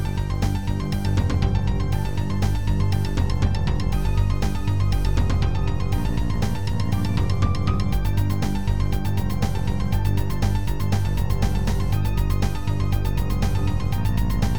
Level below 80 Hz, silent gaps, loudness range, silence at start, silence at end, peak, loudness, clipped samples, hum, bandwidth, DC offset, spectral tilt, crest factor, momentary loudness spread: -26 dBFS; none; 1 LU; 0 s; 0 s; -8 dBFS; -24 LUFS; under 0.1%; none; over 20 kHz; 5%; -7 dB/octave; 14 dB; 2 LU